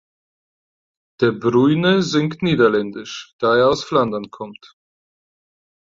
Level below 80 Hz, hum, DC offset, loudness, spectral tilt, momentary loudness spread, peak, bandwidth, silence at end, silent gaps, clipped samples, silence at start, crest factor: -56 dBFS; none; under 0.1%; -17 LUFS; -6 dB/octave; 16 LU; -2 dBFS; 7.8 kHz; 1.4 s; 3.33-3.39 s; under 0.1%; 1.2 s; 18 dB